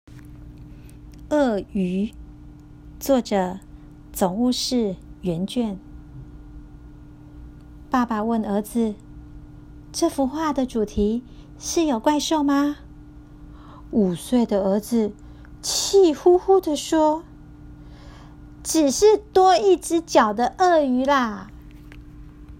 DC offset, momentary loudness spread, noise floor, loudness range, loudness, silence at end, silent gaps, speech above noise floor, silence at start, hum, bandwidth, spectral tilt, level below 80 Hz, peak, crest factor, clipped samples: under 0.1%; 17 LU; -43 dBFS; 8 LU; -21 LUFS; 0.05 s; none; 23 dB; 0.1 s; none; 16 kHz; -4.5 dB/octave; -44 dBFS; -4 dBFS; 20 dB; under 0.1%